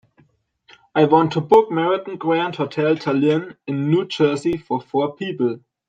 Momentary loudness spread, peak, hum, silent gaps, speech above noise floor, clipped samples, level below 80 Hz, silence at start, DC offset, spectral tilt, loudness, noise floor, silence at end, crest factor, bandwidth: 9 LU; -2 dBFS; none; none; 40 dB; under 0.1%; -60 dBFS; 0.95 s; under 0.1%; -7 dB/octave; -19 LUFS; -59 dBFS; 0.3 s; 18 dB; 9.2 kHz